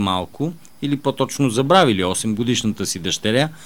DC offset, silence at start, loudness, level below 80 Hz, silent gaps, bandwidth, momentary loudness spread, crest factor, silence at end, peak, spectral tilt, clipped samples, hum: 0.7%; 0 s; -19 LUFS; -52 dBFS; none; 19.5 kHz; 12 LU; 18 dB; 0 s; 0 dBFS; -4.5 dB/octave; under 0.1%; none